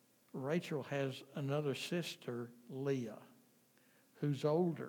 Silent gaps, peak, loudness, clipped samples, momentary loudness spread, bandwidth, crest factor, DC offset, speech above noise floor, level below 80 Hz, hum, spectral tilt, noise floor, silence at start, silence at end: none; -22 dBFS; -40 LUFS; under 0.1%; 12 LU; 19.5 kHz; 18 dB; under 0.1%; 31 dB; under -90 dBFS; none; -6.5 dB/octave; -70 dBFS; 0.35 s; 0 s